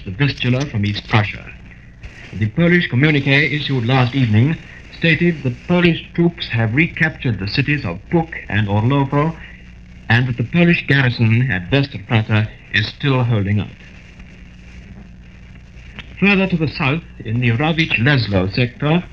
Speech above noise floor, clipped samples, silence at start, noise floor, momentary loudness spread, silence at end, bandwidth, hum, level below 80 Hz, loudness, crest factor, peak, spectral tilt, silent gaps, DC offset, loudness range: 23 dB; under 0.1%; 0 s; -39 dBFS; 9 LU; 0.05 s; 6.8 kHz; none; -40 dBFS; -17 LUFS; 16 dB; 0 dBFS; -7.5 dB/octave; none; 0.3%; 5 LU